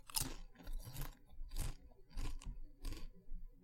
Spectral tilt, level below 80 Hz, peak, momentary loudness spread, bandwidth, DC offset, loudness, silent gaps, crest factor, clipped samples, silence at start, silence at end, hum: -2.5 dB/octave; -46 dBFS; -20 dBFS; 15 LU; 16.5 kHz; under 0.1%; -50 LUFS; none; 26 dB; under 0.1%; 0.05 s; 0 s; none